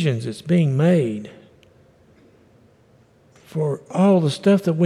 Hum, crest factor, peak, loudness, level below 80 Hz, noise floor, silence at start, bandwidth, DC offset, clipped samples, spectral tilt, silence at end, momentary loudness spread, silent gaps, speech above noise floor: none; 14 dB; -6 dBFS; -19 LUFS; -66 dBFS; -55 dBFS; 0 s; 12 kHz; under 0.1%; under 0.1%; -8 dB/octave; 0 s; 13 LU; none; 36 dB